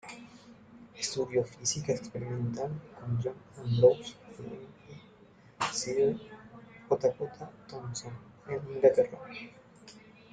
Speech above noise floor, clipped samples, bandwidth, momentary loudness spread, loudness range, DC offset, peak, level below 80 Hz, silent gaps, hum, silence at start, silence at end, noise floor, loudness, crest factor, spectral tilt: 27 dB; under 0.1%; 9.4 kHz; 26 LU; 4 LU; under 0.1%; -10 dBFS; -66 dBFS; none; none; 0.05 s; 0.35 s; -58 dBFS; -31 LUFS; 24 dB; -5 dB/octave